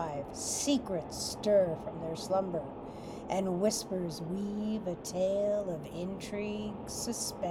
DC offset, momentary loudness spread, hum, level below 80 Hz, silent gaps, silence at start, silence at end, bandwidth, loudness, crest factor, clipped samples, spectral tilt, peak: under 0.1%; 10 LU; none; -58 dBFS; none; 0 s; 0 s; 16.5 kHz; -34 LUFS; 18 dB; under 0.1%; -4.5 dB/octave; -16 dBFS